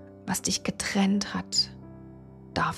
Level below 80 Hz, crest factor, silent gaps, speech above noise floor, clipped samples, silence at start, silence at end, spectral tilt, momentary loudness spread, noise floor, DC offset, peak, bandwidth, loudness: -56 dBFS; 18 dB; none; 19 dB; under 0.1%; 0 s; 0 s; -3.5 dB/octave; 22 LU; -47 dBFS; under 0.1%; -12 dBFS; 14.5 kHz; -28 LUFS